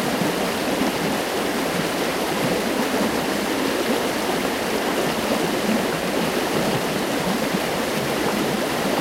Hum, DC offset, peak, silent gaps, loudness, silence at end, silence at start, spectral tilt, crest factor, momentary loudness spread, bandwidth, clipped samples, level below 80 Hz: none; under 0.1%; -8 dBFS; none; -22 LUFS; 0 s; 0 s; -4 dB/octave; 14 dB; 1 LU; 16 kHz; under 0.1%; -48 dBFS